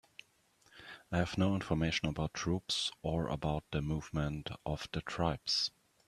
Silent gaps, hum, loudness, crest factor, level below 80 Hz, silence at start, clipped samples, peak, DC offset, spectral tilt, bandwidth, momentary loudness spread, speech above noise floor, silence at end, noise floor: none; none; -36 LUFS; 20 dB; -52 dBFS; 0.75 s; under 0.1%; -16 dBFS; under 0.1%; -5 dB/octave; 13 kHz; 9 LU; 34 dB; 0.4 s; -70 dBFS